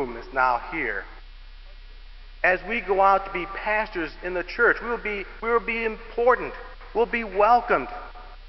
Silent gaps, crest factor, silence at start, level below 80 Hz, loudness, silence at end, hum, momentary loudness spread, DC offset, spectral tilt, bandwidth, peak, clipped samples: none; 20 dB; 0 s; -42 dBFS; -24 LUFS; 0 s; none; 12 LU; 0.1%; -6.5 dB/octave; 6 kHz; -6 dBFS; under 0.1%